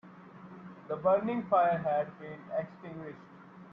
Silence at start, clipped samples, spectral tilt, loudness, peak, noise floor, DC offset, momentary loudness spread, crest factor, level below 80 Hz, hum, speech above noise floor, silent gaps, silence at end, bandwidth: 0.05 s; under 0.1%; -9.5 dB/octave; -31 LUFS; -14 dBFS; -51 dBFS; under 0.1%; 24 LU; 18 dB; -74 dBFS; none; 20 dB; none; 0 s; 5 kHz